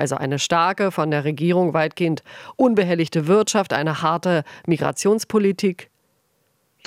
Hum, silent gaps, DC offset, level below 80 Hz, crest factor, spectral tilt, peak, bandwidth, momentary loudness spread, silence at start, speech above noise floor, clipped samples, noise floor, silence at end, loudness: none; none; under 0.1%; -66 dBFS; 16 dB; -5 dB/octave; -4 dBFS; 15.5 kHz; 6 LU; 0 s; 47 dB; under 0.1%; -66 dBFS; 1 s; -20 LUFS